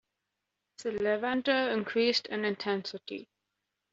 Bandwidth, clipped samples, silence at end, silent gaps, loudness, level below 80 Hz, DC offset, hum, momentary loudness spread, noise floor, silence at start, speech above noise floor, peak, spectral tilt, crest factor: 8 kHz; under 0.1%; 0.7 s; none; -30 LUFS; -74 dBFS; under 0.1%; none; 13 LU; -85 dBFS; 0.8 s; 55 dB; -14 dBFS; -2 dB/octave; 18 dB